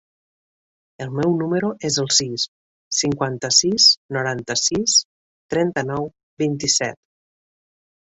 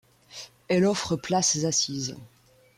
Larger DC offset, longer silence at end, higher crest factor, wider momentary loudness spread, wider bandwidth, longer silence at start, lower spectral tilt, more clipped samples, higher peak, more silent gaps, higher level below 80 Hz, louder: neither; first, 1.15 s vs 0.5 s; about the same, 20 dB vs 16 dB; second, 13 LU vs 20 LU; second, 8.4 kHz vs 14.5 kHz; first, 1 s vs 0.3 s; about the same, -2.5 dB/octave vs -3.5 dB/octave; neither; first, -2 dBFS vs -12 dBFS; first, 2.48-2.91 s, 3.97-4.09 s, 5.05-5.49 s, 6.23-6.37 s vs none; about the same, -58 dBFS vs -62 dBFS; first, -19 LUFS vs -25 LUFS